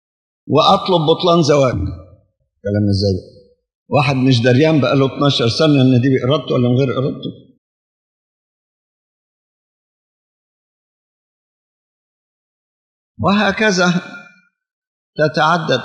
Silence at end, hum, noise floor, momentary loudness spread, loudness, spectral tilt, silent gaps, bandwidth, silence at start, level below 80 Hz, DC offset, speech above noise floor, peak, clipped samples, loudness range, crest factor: 0 s; none; -57 dBFS; 11 LU; -15 LUFS; -6 dB/octave; 3.75-3.86 s, 7.58-13.15 s, 14.73-15.13 s; 9.6 kHz; 0.45 s; -50 dBFS; under 0.1%; 43 dB; 0 dBFS; under 0.1%; 9 LU; 18 dB